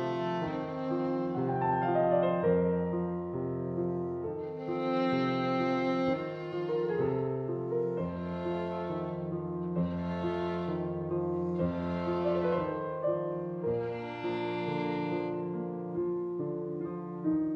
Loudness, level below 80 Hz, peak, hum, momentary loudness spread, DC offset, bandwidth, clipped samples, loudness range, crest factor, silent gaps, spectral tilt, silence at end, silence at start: -33 LUFS; -60 dBFS; -16 dBFS; none; 7 LU; under 0.1%; 6.2 kHz; under 0.1%; 4 LU; 16 dB; none; -9 dB/octave; 0 s; 0 s